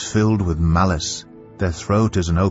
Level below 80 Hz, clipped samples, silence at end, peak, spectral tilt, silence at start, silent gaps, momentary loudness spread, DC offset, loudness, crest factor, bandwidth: -32 dBFS; under 0.1%; 0 s; -4 dBFS; -6 dB/octave; 0 s; none; 8 LU; under 0.1%; -19 LUFS; 14 dB; 8 kHz